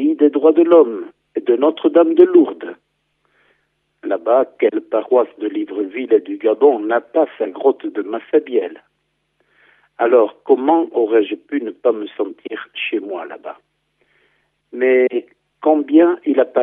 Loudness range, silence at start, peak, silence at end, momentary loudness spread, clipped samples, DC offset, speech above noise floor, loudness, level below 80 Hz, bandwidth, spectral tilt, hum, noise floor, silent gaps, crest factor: 6 LU; 0 s; 0 dBFS; 0 s; 15 LU; under 0.1%; under 0.1%; 53 dB; -16 LUFS; -78 dBFS; 3.8 kHz; -8 dB/octave; none; -69 dBFS; none; 16 dB